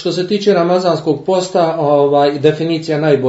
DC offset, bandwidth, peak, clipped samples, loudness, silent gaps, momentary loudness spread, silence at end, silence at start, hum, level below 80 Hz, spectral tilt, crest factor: under 0.1%; 8 kHz; 0 dBFS; under 0.1%; -14 LUFS; none; 5 LU; 0 s; 0 s; none; -58 dBFS; -6 dB/octave; 14 dB